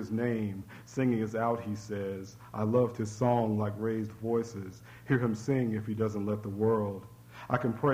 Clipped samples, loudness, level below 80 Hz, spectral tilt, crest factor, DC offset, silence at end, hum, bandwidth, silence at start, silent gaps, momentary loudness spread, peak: under 0.1%; -32 LUFS; -64 dBFS; -8 dB/octave; 18 dB; under 0.1%; 0 s; none; 16 kHz; 0 s; none; 14 LU; -14 dBFS